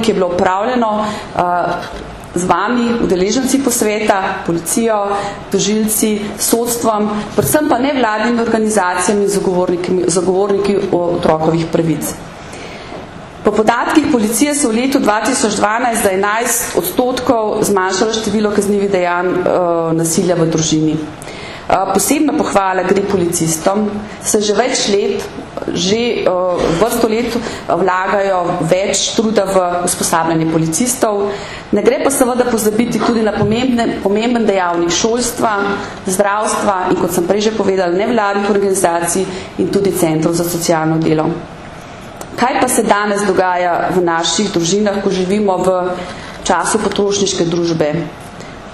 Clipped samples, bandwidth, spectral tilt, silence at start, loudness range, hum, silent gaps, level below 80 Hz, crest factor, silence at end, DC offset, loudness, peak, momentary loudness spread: under 0.1%; 14.5 kHz; -4 dB/octave; 0 s; 2 LU; none; none; -42 dBFS; 14 dB; 0 s; under 0.1%; -14 LUFS; 0 dBFS; 7 LU